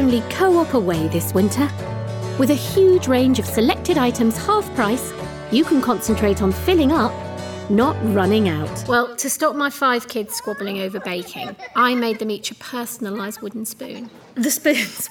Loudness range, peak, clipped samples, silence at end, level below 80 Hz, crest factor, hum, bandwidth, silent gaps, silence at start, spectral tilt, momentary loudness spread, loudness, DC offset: 6 LU; -4 dBFS; under 0.1%; 0 s; -46 dBFS; 14 dB; none; 19.5 kHz; none; 0 s; -5 dB/octave; 12 LU; -19 LUFS; under 0.1%